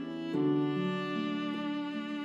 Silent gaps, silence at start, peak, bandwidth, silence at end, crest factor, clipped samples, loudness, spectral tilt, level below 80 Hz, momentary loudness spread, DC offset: none; 0 s; -20 dBFS; 7.8 kHz; 0 s; 14 dB; under 0.1%; -33 LUFS; -7.5 dB/octave; -80 dBFS; 6 LU; under 0.1%